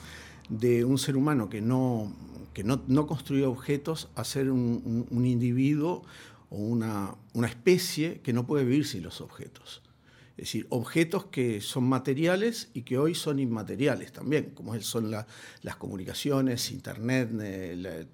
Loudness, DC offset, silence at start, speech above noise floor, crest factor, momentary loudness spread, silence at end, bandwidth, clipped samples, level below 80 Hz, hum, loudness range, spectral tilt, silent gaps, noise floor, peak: -29 LUFS; under 0.1%; 0 s; 29 dB; 20 dB; 15 LU; 0.05 s; 18 kHz; under 0.1%; -62 dBFS; none; 3 LU; -6 dB/octave; none; -58 dBFS; -10 dBFS